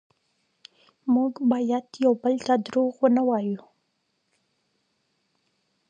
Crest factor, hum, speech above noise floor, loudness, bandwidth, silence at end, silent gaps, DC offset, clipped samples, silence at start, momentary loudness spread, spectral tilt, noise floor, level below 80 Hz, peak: 20 dB; none; 51 dB; -24 LUFS; 7.6 kHz; 2.3 s; none; under 0.1%; under 0.1%; 1.05 s; 7 LU; -6.5 dB/octave; -74 dBFS; -76 dBFS; -8 dBFS